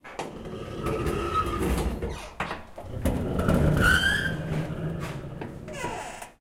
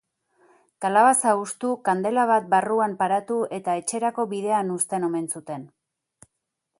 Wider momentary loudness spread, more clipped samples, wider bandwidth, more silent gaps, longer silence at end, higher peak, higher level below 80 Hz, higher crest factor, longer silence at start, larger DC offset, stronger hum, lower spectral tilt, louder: first, 16 LU vs 11 LU; neither; first, 16.5 kHz vs 12 kHz; neither; second, 0.1 s vs 1.15 s; about the same, -8 dBFS vs -6 dBFS; first, -36 dBFS vs -74 dBFS; about the same, 20 dB vs 18 dB; second, 0.05 s vs 0.8 s; neither; neither; first, -5.5 dB/octave vs -4 dB/octave; second, -28 LUFS vs -23 LUFS